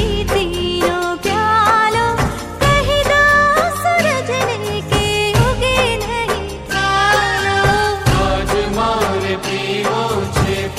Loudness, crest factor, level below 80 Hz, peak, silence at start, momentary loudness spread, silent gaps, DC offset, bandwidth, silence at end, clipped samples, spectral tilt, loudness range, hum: -15 LUFS; 14 dB; -28 dBFS; 0 dBFS; 0 s; 7 LU; none; under 0.1%; 16 kHz; 0 s; under 0.1%; -4.5 dB/octave; 3 LU; none